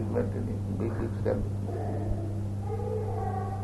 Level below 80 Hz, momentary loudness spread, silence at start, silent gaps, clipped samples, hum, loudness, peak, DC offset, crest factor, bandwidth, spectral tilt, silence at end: -42 dBFS; 3 LU; 0 s; none; under 0.1%; none; -32 LUFS; -14 dBFS; under 0.1%; 16 dB; 11.5 kHz; -9 dB/octave; 0 s